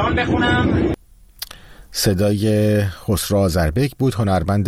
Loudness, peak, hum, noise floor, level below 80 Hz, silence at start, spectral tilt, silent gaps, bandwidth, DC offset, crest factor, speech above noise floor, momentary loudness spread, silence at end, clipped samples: -18 LUFS; -4 dBFS; none; -40 dBFS; -34 dBFS; 0 s; -5.5 dB/octave; none; 16 kHz; under 0.1%; 14 dB; 23 dB; 14 LU; 0 s; under 0.1%